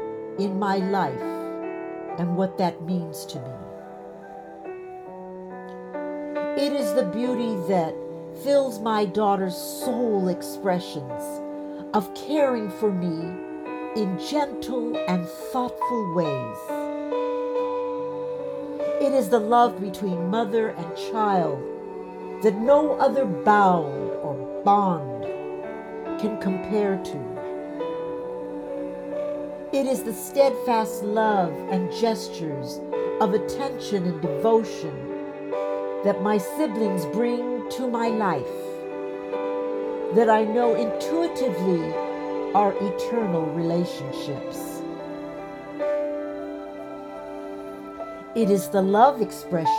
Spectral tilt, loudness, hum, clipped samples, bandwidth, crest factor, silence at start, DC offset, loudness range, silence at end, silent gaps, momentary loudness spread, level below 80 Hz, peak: -6 dB/octave; -25 LUFS; none; under 0.1%; 19.5 kHz; 22 dB; 0 s; under 0.1%; 7 LU; 0 s; none; 14 LU; -62 dBFS; -4 dBFS